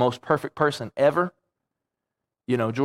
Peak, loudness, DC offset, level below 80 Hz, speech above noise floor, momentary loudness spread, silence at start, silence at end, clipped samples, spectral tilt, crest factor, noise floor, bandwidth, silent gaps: -4 dBFS; -24 LUFS; under 0.1%; -68 dBFS; 62 dB; 8 LU; 0 s; 0 s; under 0.1%; -6.5 dB/octave; 22 dB; -85 dBFS; 15 kHz; none